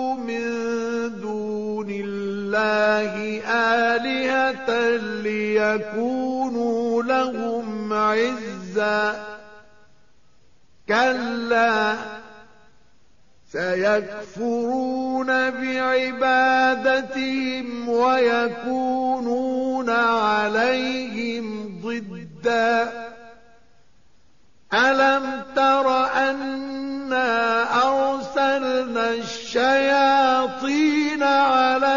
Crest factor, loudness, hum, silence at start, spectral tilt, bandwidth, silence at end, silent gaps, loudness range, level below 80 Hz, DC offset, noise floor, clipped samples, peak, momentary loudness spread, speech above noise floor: 14 dB; -21 LUFS; none; 0 s; -2 dB/octave; 7.2 kHz; 0 s; none; 5 LU; -62 dBFS; 0.3%; -61 dBFS; under 0.1%; -8 dBFS; 10 LU; 40 dB